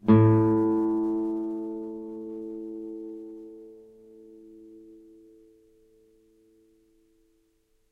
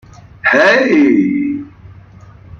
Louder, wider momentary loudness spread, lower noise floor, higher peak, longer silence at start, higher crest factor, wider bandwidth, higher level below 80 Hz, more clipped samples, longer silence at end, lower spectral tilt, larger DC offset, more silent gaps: second, -26 LUFS vs -11 LUFS; first, 29 LU vs 11 LU; first, -68 dBFS vs -38 dBFS; second, -8 dBFS vs -2 dBFS; second, 0.05 s vs 0.45 s; first, 22 dB vs 12 dB; second, 3.8 kHz vs 7.2 kHz; second, -60 dBFS vs -48 dBFS; neither; first, 2.95 s vs 0.05 s; first, -11.5 dB/octave vs -5.5 dB/octave; neither; neither